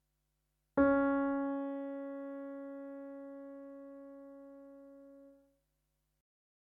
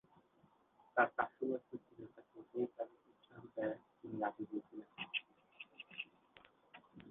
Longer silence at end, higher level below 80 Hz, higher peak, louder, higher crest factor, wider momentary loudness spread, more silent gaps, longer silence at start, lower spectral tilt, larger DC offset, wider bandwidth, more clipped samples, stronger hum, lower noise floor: first, 1.45 s vs 0 s; first, -66 dBFS vs -84 dBFS; about the same, -18 dBFS vs -18 dBFS; first, -36 LUFS vs -43 LUFS; second, 20 dB vs 26 dB; about the same, 25 LU vs 23 LU; neither; second, 0.75 s vs 0.95 s; first, -9 dB/octave vs -2.5 dB/octave; neither; second, 3.6 kHz vs 4 kHz; neither; neither; first, -82 dBFS vs -73 dBFS